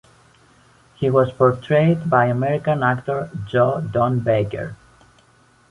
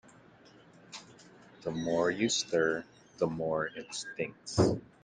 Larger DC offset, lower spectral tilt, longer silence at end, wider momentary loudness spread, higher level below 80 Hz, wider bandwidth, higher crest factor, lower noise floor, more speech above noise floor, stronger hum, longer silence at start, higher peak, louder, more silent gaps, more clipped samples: neither; first, -8.5 dB/octave vs -4.5 dB/octave; first, 0.95 s vs 0.2 s; second, 9 LU vs 19 LU; first, -52 dBFS vs -62 dBFS; about the same, 11 kHz vs 10 kHz; about the same, 18 dB vs 22 dB; about the same, -55 dBFS vs -58 dBFS; first, 36 dB vs 27 dB; neither; about the same, 1 s vs 0.9 s; first, -2 dBFS vs -12 dBFS; first, -19 LUFS vs -32 LUFS; neither; neither